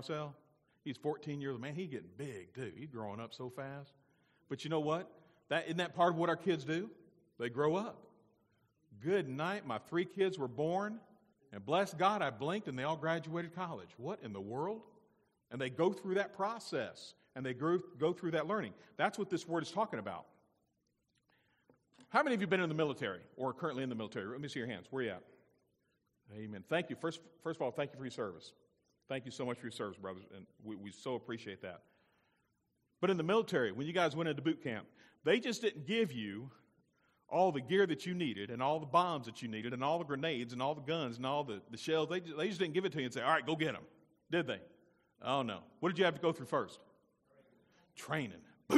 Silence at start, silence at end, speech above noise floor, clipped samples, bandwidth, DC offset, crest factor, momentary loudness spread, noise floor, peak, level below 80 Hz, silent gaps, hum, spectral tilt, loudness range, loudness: 0 s; 0 s; 44 dB; under 0.1%; 13.5 kHz; under 0.1%; 24 dB; 14 LU; -82 dBFS; -16 dBFS; -82 dBFS; none; none; -5.5 dB/octave; 8 LU; -38 LUFS